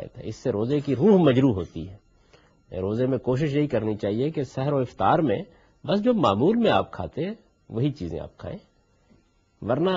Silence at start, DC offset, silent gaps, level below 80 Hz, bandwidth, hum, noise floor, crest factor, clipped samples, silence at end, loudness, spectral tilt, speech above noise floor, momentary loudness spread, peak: 0 s; under 0.1%; none; -54 dBFS; 7.6 kHz; none; -61 dBFS; 18 dB; under 0.1%; 0 s; -24 LUFS; -8 dB/octave; 38 dB; 18 LU; -6 dBFS